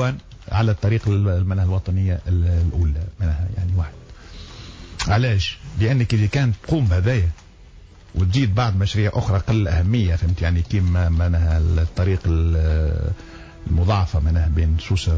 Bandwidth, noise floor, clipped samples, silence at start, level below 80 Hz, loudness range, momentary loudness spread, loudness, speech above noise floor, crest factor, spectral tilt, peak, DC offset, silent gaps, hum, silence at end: 8 kHz; -44 dBFS; under 0.1%; 0 s; -24 dBFS; 3 LU; 9 LU; -20 LUFS; 25 dB; 10 dB; -7 dB/octave; -8 dBFS; under 0.1%; none; none; 0 s